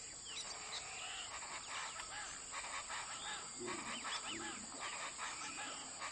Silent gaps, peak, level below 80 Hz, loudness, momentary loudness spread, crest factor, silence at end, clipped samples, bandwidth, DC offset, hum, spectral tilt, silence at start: none; -32 dBFS; -72 dBFS; -45 LUFS; 3 LU; 16 dB; 0 s; under 0.1%; 11.5 kHz; under 0.1%; none; 0 dB/octave; 0 s